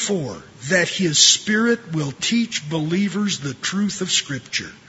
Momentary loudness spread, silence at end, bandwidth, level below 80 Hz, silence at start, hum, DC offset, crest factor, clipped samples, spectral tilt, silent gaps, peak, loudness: 13 LU; 0.1 s; 8.2 kHz; -60 dBFS; 0 s; none; under 0.1%; 20 dB; under 0.1%; -2.5 dB/octave; none; 0 dBFS; -19 LUFS